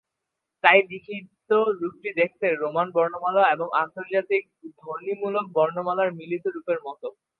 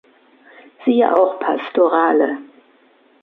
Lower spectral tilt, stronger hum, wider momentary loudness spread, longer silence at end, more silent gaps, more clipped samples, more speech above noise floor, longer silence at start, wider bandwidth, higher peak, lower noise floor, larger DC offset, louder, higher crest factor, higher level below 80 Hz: about the same, -7.5 dB/octave vs -7.5 dB/octave; neither; first, 15 LU vs 8 LU; second, 0.3 s vs 0.8 s; neither; neither; first, 59 dB vs 38 dB; second, 0.65 s vs 0.8 s; about the same, 4.5 kHz vs 4.4 kHz; about the same, 0 dBFS vs -2 dBFS; first, -83 dBFS vs -54 dBFS; neither; second, -24 LUFS vs -16 LUFS; first, 24 dB vs 16 dB; about the same, -78 dBFS vs -74 dBFS